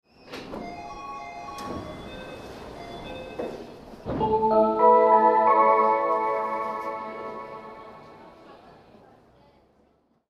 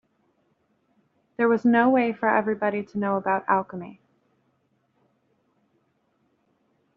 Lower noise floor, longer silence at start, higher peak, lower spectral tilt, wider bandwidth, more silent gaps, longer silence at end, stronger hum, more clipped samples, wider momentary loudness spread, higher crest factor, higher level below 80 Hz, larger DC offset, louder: second, -65 dBFS vs -70 dBFS; second, 0.25 s vs 1.4 s; about the same, -6 dBFS vs -6 dBFS; about the same, -6.5 dB/octave vs -5.5 dB/octave; first, 13 kHz vs 5.8 kHz; neither; second, 1.75 s vs 3.05 s; neither; neither; first, 23 LU vs 18 LU; about the same, 20 dB vs 22 dB; first, -54 dBFS vs -72 dBFS; neither; about the same, -22 LUFS vs -23 LUFS